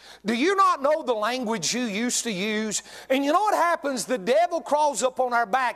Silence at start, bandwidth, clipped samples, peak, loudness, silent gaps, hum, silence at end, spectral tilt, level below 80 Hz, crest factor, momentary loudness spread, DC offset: 0.05 s; 14.5 kHz; under 0.1%; -8 dBFS; -24 LUFS; none; none; 0 s; -2.5 dB/octave; -70 dBFS; 16 dB; 6 LU; under 0.1%